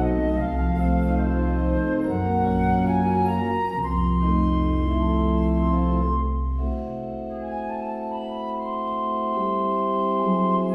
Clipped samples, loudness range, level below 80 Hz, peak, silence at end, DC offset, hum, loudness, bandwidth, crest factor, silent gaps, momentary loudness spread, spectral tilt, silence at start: under 0.1%; 6 LU; -28 dBFS; -8 dBFS; 0 s; under 0.1%; none; -24 LUFS; 4.4 kHz; 14 dB; none; 9 LU; -10 dB/octave; 0 s